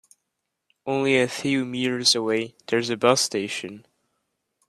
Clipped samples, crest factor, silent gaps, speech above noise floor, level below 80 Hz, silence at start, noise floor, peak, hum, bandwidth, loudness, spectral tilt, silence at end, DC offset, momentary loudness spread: under 0.1%; 22 dB; none; 57 dB; -68 dBFS; 0.85 s; -80 dBFS; -2 dBFS; none; 14.5 kHz; -23 LUFS; -3 dB/octave; 0.9 s; under 0.1%; 10 LU